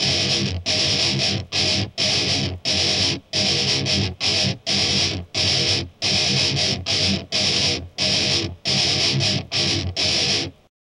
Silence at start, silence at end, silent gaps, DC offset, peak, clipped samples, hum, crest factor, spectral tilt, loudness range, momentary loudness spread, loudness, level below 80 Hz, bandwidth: 0 s; 0.3 s; none; under 0.1%; -6 dBFS; under 0.1%; none; 16 dB; -2.5 dB/octave; 1 LU; 4 LU; -19 LUFS; -46 dBFS; 11.5 kHz